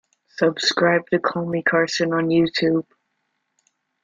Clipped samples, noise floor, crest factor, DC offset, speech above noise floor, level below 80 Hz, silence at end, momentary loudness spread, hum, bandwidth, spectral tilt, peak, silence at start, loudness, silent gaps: under 0.1%; -74 dBFS; 18 dB; under 0.1%; 54 dB; -62 dBFS; 1.2 s; 4 LU; none; 7.6 kHz; -5 dB/octave; -4 dBFS; 0.4 s; -20 LUFS; none